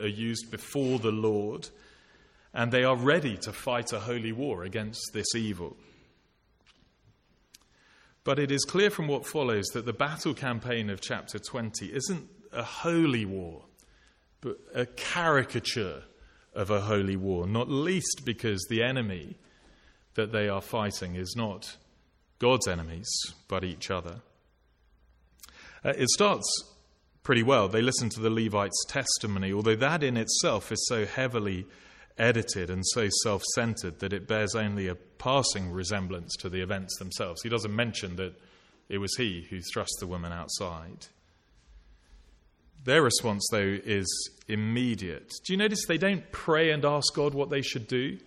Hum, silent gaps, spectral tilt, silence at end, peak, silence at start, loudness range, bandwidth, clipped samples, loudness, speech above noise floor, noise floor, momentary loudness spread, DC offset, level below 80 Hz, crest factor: none; none; -4 dB/octave; 0.1 s; -8 dBFS; 0 s; 7 LU; 16 kHz; under 0.1%; -29 LUFS; 38 dB; -67 dBFS; 12 LU; under 0.1%; -58 dBFS; 22 dB